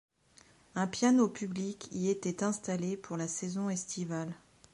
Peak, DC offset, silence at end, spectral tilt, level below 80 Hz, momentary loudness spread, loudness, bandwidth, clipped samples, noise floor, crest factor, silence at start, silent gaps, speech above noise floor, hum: -14 dBFS; under 0.1%; 0.35 s; -5 dB/octave; -72 dBFS; 11 LU; -34 LUFS; 11.5 kHz; under 0.1%; -63 dBFS; 20 dB; 0.75 s; none; 30 dB; none